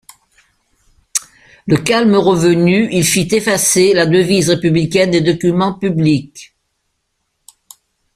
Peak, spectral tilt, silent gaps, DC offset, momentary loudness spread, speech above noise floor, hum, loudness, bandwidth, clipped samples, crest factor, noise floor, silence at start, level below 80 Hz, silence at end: 0 dBFS; -4.5 dB/octave; none; under 0.1%; 9 LU; 57 dB; none; -13 LUFS; 15.5 kHz; under 0.1%; 14 dB; -69 dBFS; 1.15 s; -48 dBFS; 1.7 s